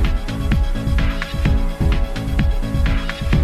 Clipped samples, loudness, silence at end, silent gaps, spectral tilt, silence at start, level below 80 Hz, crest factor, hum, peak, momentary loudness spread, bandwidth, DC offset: under 0.1%; -21 LUFS; 0 s; none; -6.5 dB/octave; 0 s; -18 dBFS; 12 dB; none; -6 dBFS; 3 LU; 13.5 kHz; under 0.1%